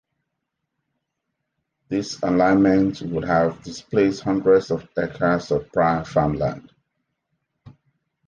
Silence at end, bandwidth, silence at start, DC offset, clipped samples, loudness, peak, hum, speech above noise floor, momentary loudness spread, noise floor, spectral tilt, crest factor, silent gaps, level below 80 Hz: 0.55 s; 9 kHz; 1.9 s; under 0.1%; under 0.1%; -21 LUFS; -6 dBFS; none; 59 dB; 10 LU; -79 dBFS; -7 dB/octave; 18 dB; none; -50 dBFS